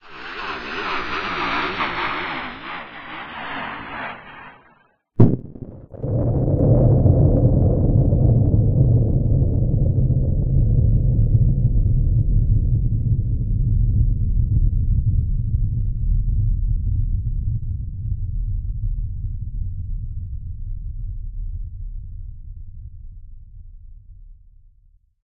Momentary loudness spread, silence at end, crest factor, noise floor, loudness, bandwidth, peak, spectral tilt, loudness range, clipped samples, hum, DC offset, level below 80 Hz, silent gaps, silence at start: 17 LU; 0.9 s; 20 dB; -57 dBFS; -21 LUFS; 5.6 kHz; 0 dBFS; -7 dB/octave; 16 LU; under 0.1%; none; under 0.1%; -24 dBFS; none; 0.05 s